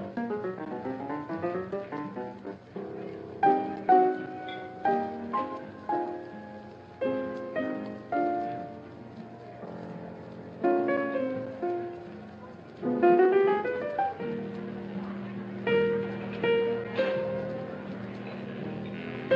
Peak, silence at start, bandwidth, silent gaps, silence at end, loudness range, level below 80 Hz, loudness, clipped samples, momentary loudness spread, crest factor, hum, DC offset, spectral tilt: -10 dBFS; 0 s; 6.4 kHz; none; 0 s; 6 LU; -68 dBFS; -30 LUFS; under 0.1%; 18 LU; 20 dB; none; under 0.1%; -8.5 dB/octave